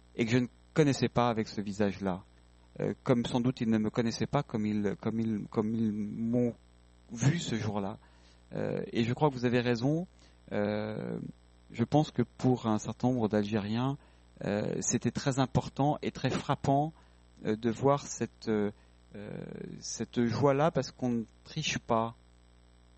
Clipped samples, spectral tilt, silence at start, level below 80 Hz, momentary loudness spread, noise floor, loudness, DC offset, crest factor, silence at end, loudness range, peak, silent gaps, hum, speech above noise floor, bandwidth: under 0.1%; -6 dB/octave; 0.15 s; -58 dBFS; 12 LU; -60 dBFS; -32 LUFS; under 0.1%; 20 dB; 0.85 s; 2 LU; -12 dBFS; none; 60 Hz at -55 dBFS; 29 dB; 8.4 kHz